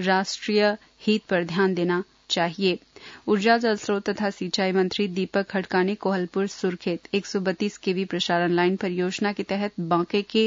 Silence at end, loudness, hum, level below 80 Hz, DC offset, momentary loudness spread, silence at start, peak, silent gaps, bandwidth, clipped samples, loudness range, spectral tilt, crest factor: 0 s; -25 LUFS; none; -66 dBFS; under 0.1%; 6 LU; 0 s; -8 dBFS; none; 7.8 kHz; under 0.1%; 2 LU; -5 dB/octave; 18 dB